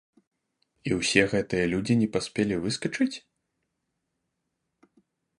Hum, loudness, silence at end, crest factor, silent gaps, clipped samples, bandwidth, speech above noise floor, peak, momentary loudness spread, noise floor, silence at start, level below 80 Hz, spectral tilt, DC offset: none; -26 LUFS; 2.2 s; 26 dB; none; under 0.1%; 11.5 kHz; 55 dB; -2 dBFS; 8 LU; -81 dBFS; 0.85 s; -56 dBFS; -5 dB/octave; under 0.1%